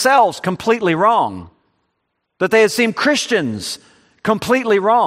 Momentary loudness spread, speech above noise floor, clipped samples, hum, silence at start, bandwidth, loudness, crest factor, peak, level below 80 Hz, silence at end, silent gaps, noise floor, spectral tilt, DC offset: 12 LU; 57 dB; under 0.1%; none; 0 s; 15.5 kHz; -16 LUFS; 16 dB; 0 dBFS; -58 dBFS; 0 s; none; -72 dBFS; -4 dB/octave; under 0.1%